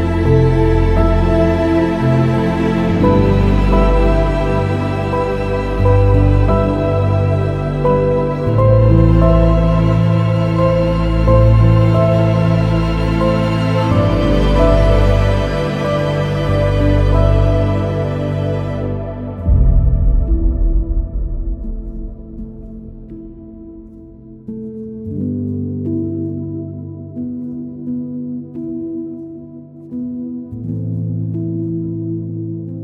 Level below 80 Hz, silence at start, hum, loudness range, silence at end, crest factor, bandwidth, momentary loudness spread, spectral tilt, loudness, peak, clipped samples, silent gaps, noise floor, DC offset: -20 dBFS; 0 s; none; 13 LU; 0 s; 14 dB; 8.2 kHz; 16 LU; -9 dB/octave; -15 LUFS; 0 dBFS; under 0.1%; none; -36 dBFS; under 0.1%